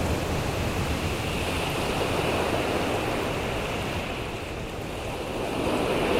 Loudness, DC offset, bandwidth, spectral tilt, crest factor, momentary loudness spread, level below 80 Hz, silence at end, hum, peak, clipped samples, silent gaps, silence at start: -28 LUFS; under 0.1%; 16 kHz; -5 dB/octave; 16 dB; 7 LU; -38 dBFS; 0 s; none; -12 dBFS; under 0.1%; none; 0 s